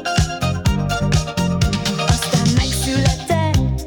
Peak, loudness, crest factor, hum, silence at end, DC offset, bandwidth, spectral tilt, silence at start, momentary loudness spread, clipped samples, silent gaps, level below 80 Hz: -6 dBFS; -18 LUFS; 12 dB; none; 0 s; under 0.1%; 18 kHz; -5 dB/octave; 0 s; 3 LU; under 0.1%; none; -26 dBFS